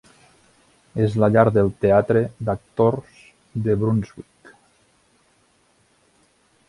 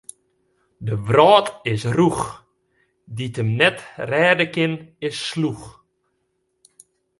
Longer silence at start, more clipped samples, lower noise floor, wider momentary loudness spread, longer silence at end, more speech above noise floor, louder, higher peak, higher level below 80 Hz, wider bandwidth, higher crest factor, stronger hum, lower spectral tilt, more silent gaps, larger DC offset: first, 0.95 s vs 0.8 s; neither; second, -61 dBFS vs -71 dBFS; about the same, 15 LU vs 16 LU; first, 2.45 s vs 1.5 s; second, 42 dB vs 52 dB; about the same, -20 LUFS vs -19 LUFS; about the same, 0 dBFS vs 0 dBFS; about the same, -50 dBFS vs -54 dBFS; about the same, 11 kHz vs 11.5 kHz; about the same, 22 dB vs 20 dB; neither; first, -9 dB/octave vs -5.5 dB/octave; neither; neither